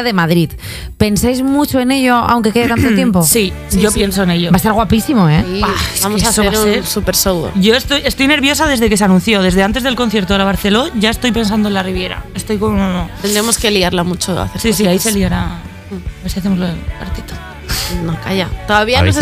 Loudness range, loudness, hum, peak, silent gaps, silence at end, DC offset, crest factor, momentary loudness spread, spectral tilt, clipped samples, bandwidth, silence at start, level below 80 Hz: 5 LU; -13 LUFS; none; 0 dBFS; none; 0 s; under 0.1%; 12 dB; 10 LU; -4.5 dB/octave; under 0.1%; 16.5 kHz; 0 s; -28 dBFS